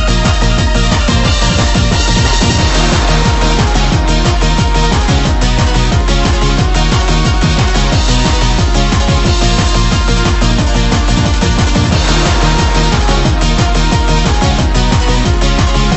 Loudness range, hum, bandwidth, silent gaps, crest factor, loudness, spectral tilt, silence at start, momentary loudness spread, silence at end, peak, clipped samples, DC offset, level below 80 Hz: 1 LU; none; 8.4 kHz; none; 10 dB; -11 LUFS; -4.5 dB/octave; 0 s; 1 LU; 0 s; 0 dBFS; under 0.1%; under 0.1%; -12 dBFS